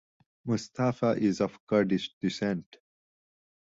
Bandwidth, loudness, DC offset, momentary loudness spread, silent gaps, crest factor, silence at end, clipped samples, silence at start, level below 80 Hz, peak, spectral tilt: 7.8 kHz; -29 LUFS; under 0.1%; 6 LU; 1.60-1.67 s, 2.13-2.21 s; 18 dB; 1.15 s; under 0.1%; 0.45 s; -66 dBFS; -12 dBFS; -6.5 dB/octave